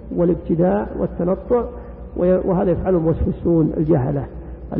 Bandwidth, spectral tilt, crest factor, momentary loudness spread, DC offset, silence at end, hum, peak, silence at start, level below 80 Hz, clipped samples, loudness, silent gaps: 3.8 kHz; -14.5 dB/octave; 14 dB; 12 LU; under 0.1%; 0 s; none; -6 dBFS; 0 s; -34 dBFS; under 0.1%; -19 LUFS; none